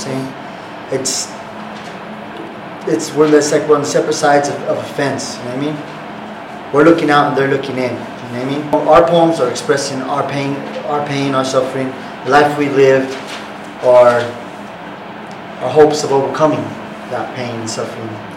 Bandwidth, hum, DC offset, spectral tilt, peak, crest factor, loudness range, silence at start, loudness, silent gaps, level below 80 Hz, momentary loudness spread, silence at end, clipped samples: 16 kHz; none; under 0.1%; -4.5 dB/octave; 0 dBFS; 16 dB; 3 LU; 0 s; -14 LUFS; none; -52 dBFS; 18 LU; 0 s; under 0.1%